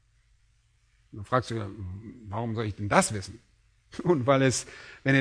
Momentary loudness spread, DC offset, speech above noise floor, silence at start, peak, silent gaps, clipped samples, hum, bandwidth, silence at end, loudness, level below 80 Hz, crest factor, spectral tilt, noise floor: 20 LU; under 0.1%; 38 dB; 1.15 s; -4 dBFS; none; under 0.1%; none; 11 kHz; 0 s; -27 LUFS; -58 dBFS; 26 dB; -5 dB/octave; -66 dBFS